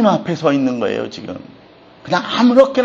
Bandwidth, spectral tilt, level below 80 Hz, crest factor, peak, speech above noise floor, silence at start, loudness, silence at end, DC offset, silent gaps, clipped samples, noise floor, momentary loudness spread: 7.6 kHz; -6 dB/octave; -58 dBFS; 16 dB; 0 dBFS; 29 dB; 0 s; -16 LUFS; 0 s; under 0.1%; none; under 0.1%; -44 dBFS; 19 LU